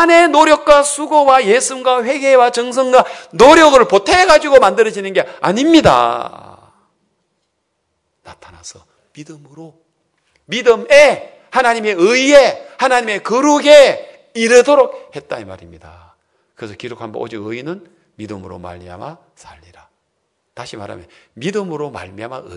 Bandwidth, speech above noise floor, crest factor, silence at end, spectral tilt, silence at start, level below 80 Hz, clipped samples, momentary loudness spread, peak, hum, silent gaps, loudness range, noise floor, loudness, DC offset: 12 kHz; 56 dB; 14 dB; 0 s; -3.5 dB/octave; 0 s; -46 dBFS; 1%; 22 LU; 0 dBFS; none; none; 20 LU; -69 dBFS; -11 LUFS; under 0.1%